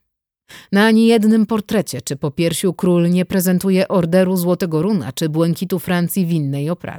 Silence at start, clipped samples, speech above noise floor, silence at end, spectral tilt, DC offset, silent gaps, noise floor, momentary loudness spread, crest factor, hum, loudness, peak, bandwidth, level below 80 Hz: 0.5 s; under 0.1%; 48 dB; 0 s; -6 dB/octave; under 0.1%; none; -64 dBFS; 8 LU; 14 dB; none; -17 LUFS; -2 dBFS; 19 kHz; -54 dBFS